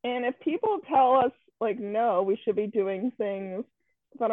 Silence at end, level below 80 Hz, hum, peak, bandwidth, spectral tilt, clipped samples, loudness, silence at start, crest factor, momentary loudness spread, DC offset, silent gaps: 0 s; -76 dBFS; none; -12 dBFS; 4 kHz; -9 dB/octave; under 0.1%; -27 LUFS; 0.05 s; 16 dB; 11 LU; under 0.1%; none